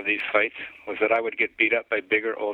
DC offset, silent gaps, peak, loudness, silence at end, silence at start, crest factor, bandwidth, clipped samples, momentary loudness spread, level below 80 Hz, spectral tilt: under 0.1%; none; -6 dBFS; -23 LUFS; 0 s; 0 s; 20 dB; 4.9 kHz; under 0.1%; 6 LU; -68 dBFS; -5.5 dB/octave